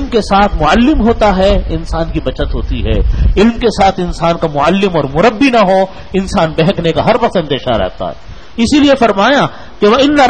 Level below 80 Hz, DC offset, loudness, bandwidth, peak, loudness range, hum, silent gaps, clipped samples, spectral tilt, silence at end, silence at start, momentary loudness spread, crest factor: -20 dBFS; 3%; -11 LUFS; 10 kHz; 0 dBFS; 2 LU; none; none; under 0.1%; -6 dB/octave; 0 s; 0 s; 9 LU; 10 dB